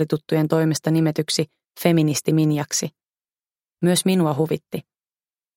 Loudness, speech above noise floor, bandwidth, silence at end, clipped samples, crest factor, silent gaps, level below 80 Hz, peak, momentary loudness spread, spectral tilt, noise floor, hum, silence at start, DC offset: -21 LUFS; over 70 dB; 17 kHz; 0.75 s; under 0.1%; 20 dB; none; -64 dBFS; -2 dBFS; 9 LU; -5.5 dB/octave; under -90 dBFS; none; 0 s; under 0.1%